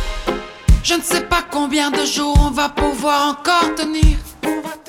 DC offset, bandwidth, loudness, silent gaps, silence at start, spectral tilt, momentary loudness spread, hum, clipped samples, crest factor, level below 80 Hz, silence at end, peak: under 0.1%; 16.5 kHz; -17 LUFS; none; 0 s; -4 dB/octave; 7 LU; none; under 0.1%; 16 dB; -20 dBFS; 0.1 s; 0 dBFS